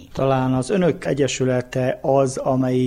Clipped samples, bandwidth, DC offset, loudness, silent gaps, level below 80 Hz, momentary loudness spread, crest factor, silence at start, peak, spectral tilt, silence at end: under 0.1%; 12 kHz; under 0.1%; -20 LUFS; none; -48 dBFS; 3 LU; 14 dB; 0 s; -6 dBFS; -6 dB/octave; 0 s